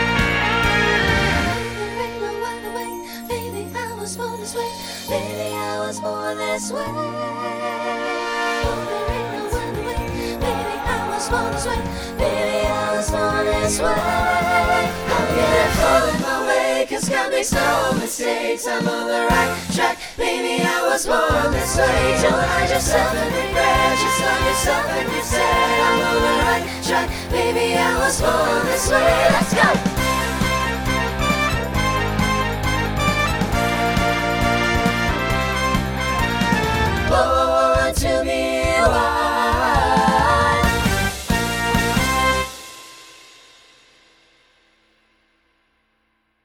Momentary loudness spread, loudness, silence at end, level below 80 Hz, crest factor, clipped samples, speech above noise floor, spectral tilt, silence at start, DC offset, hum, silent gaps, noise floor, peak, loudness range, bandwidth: 9 LU; -19 LUFS; 3.3 s; -32 dBFS; 18 dB; under 0.1%; 48 dB; -4 dB/octave; 0 s; under 0.1%; none; none; -67 dBFS; -2 dBFS; 7 LU; over 20 kHz